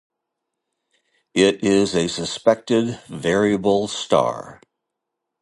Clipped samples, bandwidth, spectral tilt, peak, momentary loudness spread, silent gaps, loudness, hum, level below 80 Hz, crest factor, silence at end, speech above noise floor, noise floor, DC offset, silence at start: under 0.1%; 11.5 kHz; -4.5 dB/octave; -2 dBFS; 8 LU; none; -20 LUFS; none; -54 dBFS; 20 dB; 0.85 s; 62 dB; -81 dBFS; under 0.1%; 1.35 s